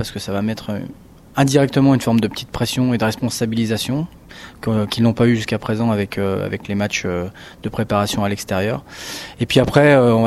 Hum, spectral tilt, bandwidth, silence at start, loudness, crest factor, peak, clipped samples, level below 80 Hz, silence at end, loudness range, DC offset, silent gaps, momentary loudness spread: none; -6 dB/octave; 15 kHz; 0 s; -18 LUFS; 18 dB; 0 dBFS; under 0.1%; -44 dBFS; 0 s; 3 LU; under 0.1%; none; 13 LU